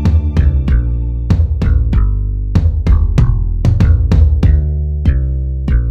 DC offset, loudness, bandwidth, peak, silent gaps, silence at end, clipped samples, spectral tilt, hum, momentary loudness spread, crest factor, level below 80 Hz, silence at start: under 0.1%; -14 LUFS; 6.2 kHz; 0 dBFS; none; 0 s; under 0.1%; -9 dB/octave; none; 6 LU; 10 dB; -12 dBFS; 0 s